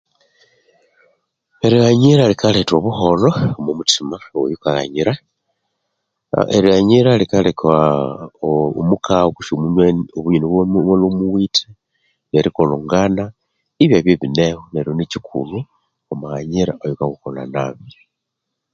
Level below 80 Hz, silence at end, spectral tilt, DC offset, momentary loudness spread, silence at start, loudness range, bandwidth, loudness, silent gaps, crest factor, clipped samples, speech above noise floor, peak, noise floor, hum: -44 dBFS; 0.85 s; -6 dB/octave; under 0.1%; 12 LU; 1.65 s; 6 LU; 9 kHz; -16 LUFS; none; 16 dB; under 0.1%; 63 dB; 0 dBFS; -78 dBFS; none